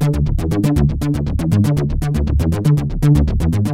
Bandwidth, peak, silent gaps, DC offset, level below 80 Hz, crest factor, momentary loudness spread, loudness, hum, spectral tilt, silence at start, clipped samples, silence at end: 15.5 kHz; -2 dBFS; none; under 0.1%; -22 dBFS; 12 dB; 4 LU; -17 LUFS; none; -8 dB/octave; 0 s; under 0.1%; 0 s